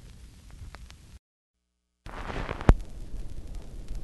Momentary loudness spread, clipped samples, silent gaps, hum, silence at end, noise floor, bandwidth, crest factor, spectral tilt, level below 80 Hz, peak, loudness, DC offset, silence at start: 25 LU; under 0.1%; 1.19-1.54 s; none; 0 s; -79 dBFS; 12 kHz; 32 dB; -7 dB/octave; -32 dBFS; 0 dBFS; -31 LUFS; under 0.1%; 0 s